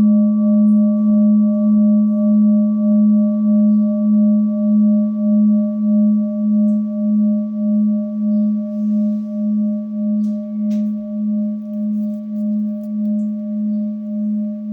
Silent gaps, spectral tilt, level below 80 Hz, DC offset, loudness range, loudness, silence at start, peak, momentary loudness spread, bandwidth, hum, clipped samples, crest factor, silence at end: none; -13 dB/octave; -68 dBFS; under 0.1%; 7 LU; -16 LUFS; 0 s; -8 dBFS; 8 LU; 1.2 kHz; none; under 0.1%; 8 dB; 0 s